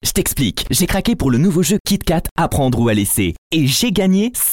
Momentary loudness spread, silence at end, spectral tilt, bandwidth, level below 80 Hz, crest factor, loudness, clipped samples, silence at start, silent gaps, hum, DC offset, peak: 3 LU; 0 s; -4.5 dB/octave; 17 kHz; -30 dBFS; 12 dB; -16 LUFS; under 0.1%; 0.05 s; 1.80-1.85 s, 2.31-2.36 s, 3.38-3.51 s; none; 0.6%; -4 dBFS